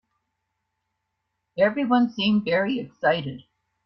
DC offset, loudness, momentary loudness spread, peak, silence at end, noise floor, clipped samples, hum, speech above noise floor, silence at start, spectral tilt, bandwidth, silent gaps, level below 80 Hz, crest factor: under 0.1%; -23 LUFS; 15 LU; -6 dBFS; 0.45 s; -79 dBFS; under 0.1%; none; 56 dB; 1.55 s; -7.5 dB/octave; 6.2 kHz; none; -66 dBFS; 18 dB